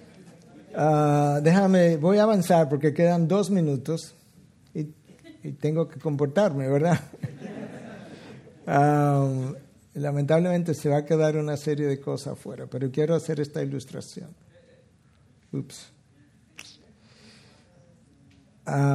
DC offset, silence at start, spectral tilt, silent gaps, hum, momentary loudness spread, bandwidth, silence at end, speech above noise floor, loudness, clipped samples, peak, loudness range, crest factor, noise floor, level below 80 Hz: under 0.1%; 0.25 s; -7.5 dB/octave; none; none; 21 LU; 13.5 kHz; 0 s; 36 dB; -24 LUFS; under 0.1%; -6 dBFS; 21 LU; 20 dB; -59 dBFS; -68 dBFS